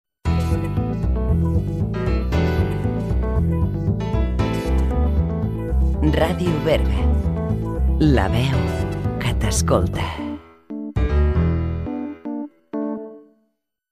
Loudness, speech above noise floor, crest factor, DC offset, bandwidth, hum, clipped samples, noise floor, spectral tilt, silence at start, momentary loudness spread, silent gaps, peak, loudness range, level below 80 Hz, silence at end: -21 LUFS; 52 dB; 16 dB; under 0.1%; 14 kHz; none; under 0.1%; -70 dBFS; -7 dB/octave; 0.25 s; 10 LU; none; -4 dBFS; 4 LU; -24 dBFS; 0.7 s